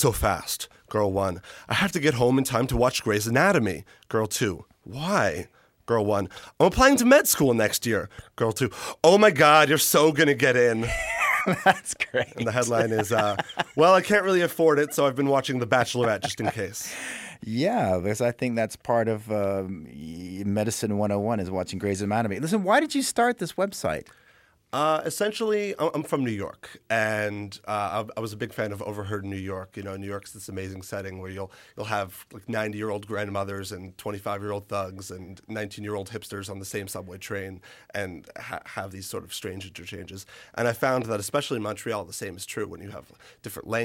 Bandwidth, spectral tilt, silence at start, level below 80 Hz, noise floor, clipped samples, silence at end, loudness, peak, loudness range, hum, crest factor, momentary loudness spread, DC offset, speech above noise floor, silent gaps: 16.5 kHz; -4.5 dB/octave; 0 s; -50 dBFS; -60 dBFS; under 0.1%; 0 s; -25 LUFS; -4 dBFS; 14 LU; none; 20 dB; 17 LU; under 0.1%; 34 dB; none